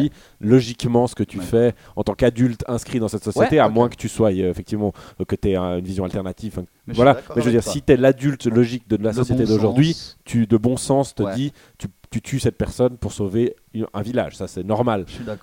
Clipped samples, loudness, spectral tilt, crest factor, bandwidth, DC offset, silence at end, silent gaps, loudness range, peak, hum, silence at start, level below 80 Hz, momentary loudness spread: under 0.1%; -20 LUFS; -6.5 dB/octave; 18 dB; 17 kHz; under 0.1%; 0.05 s; none; 5 LU; -2 dBFS; none; 0 s; -42 dBFS; 12 LU